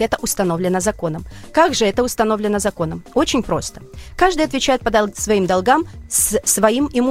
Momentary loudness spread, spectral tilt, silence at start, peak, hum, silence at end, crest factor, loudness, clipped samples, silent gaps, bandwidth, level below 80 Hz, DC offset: 8 LU; -3.5 dB/octave; 0 s; 0 dBFS; none; 0 s; 18 dB; -17 LUFS; under 0.1%; none; 16 kHz; -38 dBFS; under 0.1%